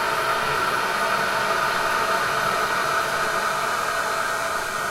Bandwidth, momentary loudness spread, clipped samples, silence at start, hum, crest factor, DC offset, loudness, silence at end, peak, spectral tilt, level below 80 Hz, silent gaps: 16 kHz; 2 LU; under 0.1%; 0 s; none; 14 dB; under 0.1%; -22 LUFS; 0 s; -10 dBFS; -2 dB/octave; -50 dBFS; none